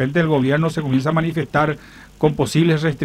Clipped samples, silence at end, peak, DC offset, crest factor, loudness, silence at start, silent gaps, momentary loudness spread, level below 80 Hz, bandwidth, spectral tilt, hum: under 0.1%; 0 s; -2 dBFS; under 0.1%; 16 dB; -18 LUFS; 0 s; none; 4 LU; -46 dBFS; 13.5 kHz; -7 dB/octave; none